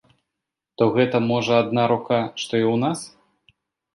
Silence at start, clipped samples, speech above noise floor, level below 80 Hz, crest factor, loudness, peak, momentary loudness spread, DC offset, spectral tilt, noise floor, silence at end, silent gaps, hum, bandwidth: 0.8 s; under 0.1%; 63 dB; -64 dBFS; 18 dB; -21 LUFS; -4 dBFS; 6 LU; under 0.1%; -6 dB/octave; -84 dBFS; 0.85 s; none; none; 11.5 kHz